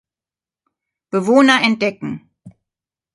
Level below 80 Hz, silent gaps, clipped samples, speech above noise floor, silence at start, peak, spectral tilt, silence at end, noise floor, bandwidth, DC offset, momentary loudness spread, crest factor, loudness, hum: -64 dBFS; none; under 0.1%; over 75 dB; 1.15 s; 0 dBFS; -4.5 dB/octave; 0.65 s; under -90 dBFS; 11.5 kHz; under 0.1%; 17 LU; 18 dB; -15 LUFS; none